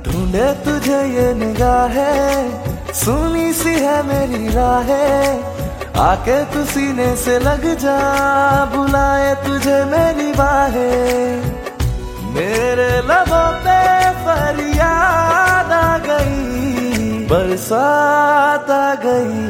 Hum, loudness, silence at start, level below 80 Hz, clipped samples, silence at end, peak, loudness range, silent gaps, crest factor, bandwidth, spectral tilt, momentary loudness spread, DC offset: none; -15 LUFS; 0 s; -28 dBFS; under 0.1%; 0 s; -2 dBFS; 3 LU; none; 14 dB; 16.5 kHz; -5 dB/octave; 7 LU; under 0.1%